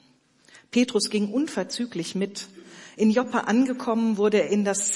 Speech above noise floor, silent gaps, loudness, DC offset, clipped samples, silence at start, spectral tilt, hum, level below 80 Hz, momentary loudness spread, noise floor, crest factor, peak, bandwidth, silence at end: 36 dB; none; -24 LUFS; under 0.1%; under 0.1%; 0.75 s; -4 dB/octave; none; -74 dBFS; 10 LU; -59 dBFS; 16 dB; -8 dBFS; 11.5 kHz; 0 s